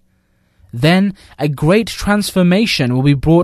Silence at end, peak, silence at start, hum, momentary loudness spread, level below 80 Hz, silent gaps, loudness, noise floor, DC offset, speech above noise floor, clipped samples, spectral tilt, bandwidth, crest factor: 0 s; 0 dBFS; 0.75 s; none; 8 LU; -36 dBFS; none; -14 LUFS; -59 dBFS; under 0.1%; 45 dB; under 0.1%; -6 dB/octave; 13.5 kHz; 14 dB